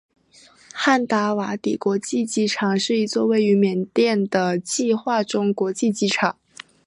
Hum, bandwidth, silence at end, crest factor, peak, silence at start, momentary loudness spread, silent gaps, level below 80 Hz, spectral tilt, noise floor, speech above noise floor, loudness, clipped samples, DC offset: none; 11.5 kHz; 0.55 s; 18 dB; -4 dBFS; 0.75 s; 5 LU; none; -70 dBFS; -4.5 dB/octave; -52 dBFS; 32 dB; -21 LUFS; under 0.1%; under 0.1%